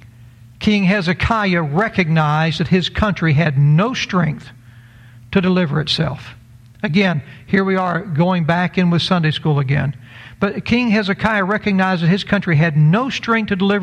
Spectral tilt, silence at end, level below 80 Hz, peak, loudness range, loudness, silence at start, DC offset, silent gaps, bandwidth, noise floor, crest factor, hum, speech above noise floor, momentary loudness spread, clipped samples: -7 dB/octave; 0 s; -42 dBFS; -2 dBFS; 3 LU; -17 LUFS; 0.05 s; under 0.1%; none; 9.2 kHz; -42 dBFS; 14 dB; none; 26 dB; 6 LU; under 0.1%